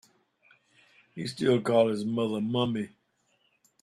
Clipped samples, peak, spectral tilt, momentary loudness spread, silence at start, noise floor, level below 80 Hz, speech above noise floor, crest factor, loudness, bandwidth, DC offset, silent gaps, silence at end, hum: under 0.1%; -12 dBFS; -6.5 dB/octave; 14 LU; 1.15 s; -71 dBFS; -70 dBFS; 44 dB; 20 dB; -28 LUFS; 13 kHz; under 0.1%; none; 0.95 s; none